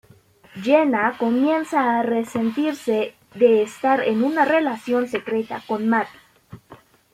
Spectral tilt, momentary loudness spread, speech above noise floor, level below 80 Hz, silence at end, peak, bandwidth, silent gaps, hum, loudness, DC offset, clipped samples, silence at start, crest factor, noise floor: -5.5 dB/octave; 8 LU; 32 dB; -66 dBFS; 0.4 s; -4 dBFS; 15 kHz; none; none; -21 LUFS; under 0.1%; under 0.1%; 0.55 s; 18 dB; -52 dBFS